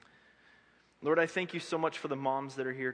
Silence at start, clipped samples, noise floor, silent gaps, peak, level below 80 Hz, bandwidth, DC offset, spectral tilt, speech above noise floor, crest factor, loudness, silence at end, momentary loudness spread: 1 s; under 0.1%; -65 dBFS; none; -14 dBFS; -82 dBFS; 10.5 kHz; under 0.1%; -5 dB/octave; 32 dB; 22 dB; -33 LUFS; 0 s; 7 LU